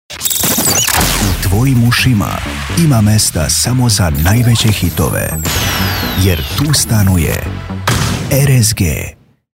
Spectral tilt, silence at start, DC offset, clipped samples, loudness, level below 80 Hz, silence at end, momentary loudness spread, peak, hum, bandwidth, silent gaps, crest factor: -4 dB/octave; 0.1 s; under 0.1%; under 0.1%; -12 LUFS; -26 dBFS; 0.45 s; 7 LU; 0 dBFS; none; 16.5 kHz; none; 12 dB